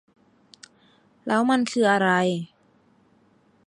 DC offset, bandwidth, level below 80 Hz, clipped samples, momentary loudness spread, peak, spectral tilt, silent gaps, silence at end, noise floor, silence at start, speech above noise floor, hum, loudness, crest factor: under 0.1%; 11.5 kHz; -74 dBFS; under 0.1%; 16 LU; -6 dBFS; -5 dB/octave; none; 1.2 s; -61 dBFS; 1.25 s; 39 dB; none; -22 LUFS; 20 dB